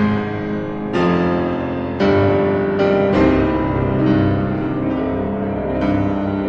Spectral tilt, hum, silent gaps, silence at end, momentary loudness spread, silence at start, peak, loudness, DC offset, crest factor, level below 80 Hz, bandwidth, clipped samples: -9 dB/octave; none; none; 0 s; 7 LU; 0 s; -2 dBFS; -18 LUFS; under 0.1%; 14 dB; -36 dBFS; 7.2 kHz; under 0.1%